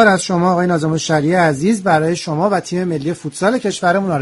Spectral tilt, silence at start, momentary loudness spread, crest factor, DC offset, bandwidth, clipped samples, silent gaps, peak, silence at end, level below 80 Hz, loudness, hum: -5.5 dB/octave; 0 s; 5 LU; 16 dB; under 0.1%; 11.5 kHz; under 0.1%; none; 0 dBFS; 0 s; -52 dBFS; -16 LUFS; none